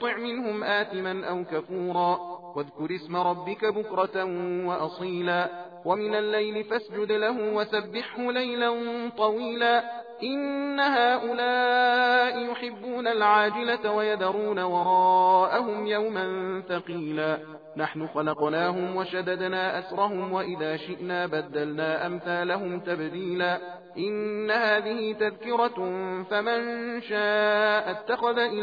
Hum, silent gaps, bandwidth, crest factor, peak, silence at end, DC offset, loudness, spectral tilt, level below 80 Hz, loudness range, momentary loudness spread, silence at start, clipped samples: none; none; 5 kHz; 18 dB; -8 dBFS; 0 s; under 0.1%; -27 LUFS; -7 dB/octave; -78 dBFS; 6 LU; 10 LU; 0 s; under 0.1%